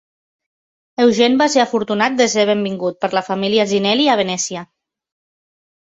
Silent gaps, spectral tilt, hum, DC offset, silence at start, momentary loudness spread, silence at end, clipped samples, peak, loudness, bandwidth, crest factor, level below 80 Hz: none; -3.5 dB/octave; none; under 0.1%; 1 s; 8 LU; 1.2 s; under 0.1%; -2 dBFS; -16 LUFS; 8.4 kHz; 16 dB; -62 dBFS